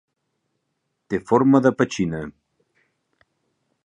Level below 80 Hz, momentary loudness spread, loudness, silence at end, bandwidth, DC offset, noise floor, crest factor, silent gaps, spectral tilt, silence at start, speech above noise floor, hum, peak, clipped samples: -56 dBFS; 15 LU; -20 LUFS; 1.55 s; 9.8 kHz; under 0.1%; -76 dBFS; 22 dB; none; -7 dB/octave; 1.1 s; 57 dB; none; -2 dBFS; under 0.1%